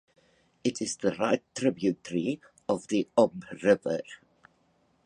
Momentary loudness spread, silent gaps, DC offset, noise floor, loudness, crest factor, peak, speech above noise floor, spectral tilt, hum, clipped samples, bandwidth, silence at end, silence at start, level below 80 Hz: 8 LU; none; under 0.1%; -68 dBFS; -29 LUFS; 22 dB; -8 dBFS; 41 dB; -5 dB/octave; none; under 0.1%; 11 kHz; 0.9 s; 0.65 s; -68 dBFS